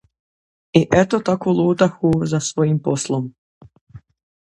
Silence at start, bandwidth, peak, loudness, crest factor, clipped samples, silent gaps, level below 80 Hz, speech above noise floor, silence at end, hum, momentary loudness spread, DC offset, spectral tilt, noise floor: 0.75 s; 11.5 kHz; 0 dBFS; -18 LUFS; 20 dB; under 0.1%; 3.38-3.61 s, 3.81-3.87 s; -50 dBFS; over 73 dB; 0.6 s; none; 6 LU; under 0.1%; -6 dB/octave; under -90 dBFS